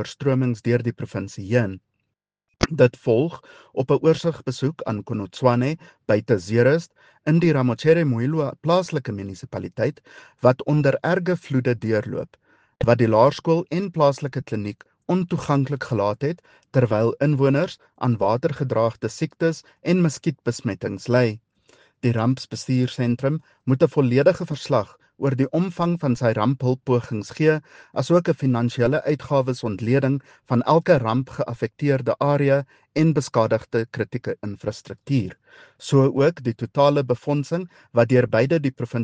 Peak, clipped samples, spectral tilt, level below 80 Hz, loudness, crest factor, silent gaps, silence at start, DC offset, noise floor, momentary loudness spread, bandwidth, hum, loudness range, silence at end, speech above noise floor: 0 dBFS; under 0.1%; -7.5 dB/octave; -54 dBFS; -22 LUFS; 20 dB; none; 0 s; under 0.1%; -79 dBFS; 11 LU; 9.2 kHz; none; 3 LU; 0 s; 58 dB